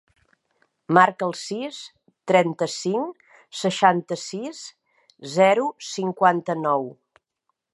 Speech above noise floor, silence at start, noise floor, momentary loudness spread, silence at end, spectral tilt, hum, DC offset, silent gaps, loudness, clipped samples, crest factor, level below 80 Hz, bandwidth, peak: 55 dB; 0.9 s; -77 dBFS; 19 LU; 0.8 s; -4.5 dB/octave; none; under 0.1%; none; -22 LUFS; under 0.1%; 22 dB; -76 dBFS; 11.5 kHz; 0 dBFS